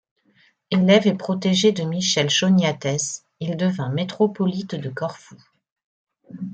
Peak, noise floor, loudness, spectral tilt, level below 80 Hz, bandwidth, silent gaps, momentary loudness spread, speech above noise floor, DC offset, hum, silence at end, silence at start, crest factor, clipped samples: -4 dBFS; -60 dBFS; -21 LUFS; -4.5 dB/octave; -64 dBFS; 9 kHz; 5.72-5.76 s, 5.84-6.07 s; 13 LU; 40 dB; under 0.1%; none; 0 s; 0.7 s; 18 dB; under 0.1%